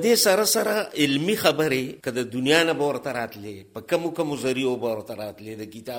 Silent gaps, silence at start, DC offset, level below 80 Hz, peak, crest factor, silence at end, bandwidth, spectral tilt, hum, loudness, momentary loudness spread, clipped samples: none; 0 s; under 0.1%; -64 dBFS; -6 dBFS; 18 dB; 0 s; 17.5 kHz; -3.5 dB/octave; none; -23 LUFS; 17 LU; under 0.1%